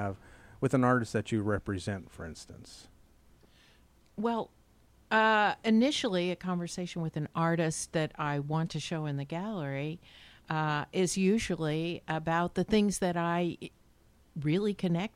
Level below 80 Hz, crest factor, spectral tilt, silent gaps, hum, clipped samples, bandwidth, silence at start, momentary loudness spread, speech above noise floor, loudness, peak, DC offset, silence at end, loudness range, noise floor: -58 dBFS; 18 dB; -5.5 dB/octave; none; none; under 0.1%; 14.5 kHz; 0 s; 18 LU; 32 dB; -31 LUFS; -14 dBFS; under 0.1%; 0.1 s; 7 LU; -63 dBFS